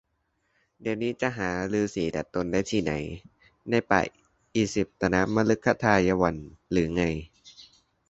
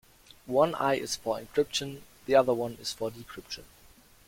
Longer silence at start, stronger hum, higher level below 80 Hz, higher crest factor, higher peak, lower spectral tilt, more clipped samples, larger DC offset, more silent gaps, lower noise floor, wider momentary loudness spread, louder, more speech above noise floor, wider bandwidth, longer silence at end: first, 0.8 s vs 0.45 s; neither; first, -50 dBFS vs -62 dBFS; about the same, 24 dB vs 22 dB; first, -4 dBFS vs -8 dBFS; first, -6 dB/octave vs -4 dB/octave; neither; neither; neither; first, -74 dBFS vs -57 dBFS; second, 11 LU vs 17 LU; about the same, -27 LUFS vs -29 LUFS; first, 48 dB vs 28 dB; second, 8.2 kHz vs 16.5 kHz; second, 0.45 s vs 0.65 s